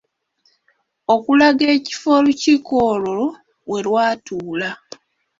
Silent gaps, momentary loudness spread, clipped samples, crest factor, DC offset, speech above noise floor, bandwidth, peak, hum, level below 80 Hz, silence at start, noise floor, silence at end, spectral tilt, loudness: none; 13 LU; under 0.1%; 16 dB; under 0.1%; 48 dB; 7.8 kHz; -2 dBFS; none; -58 dBFS; 1.1 s; -65 dBFS; 0.65 s; -4.5 dB/octave; -17 LUFS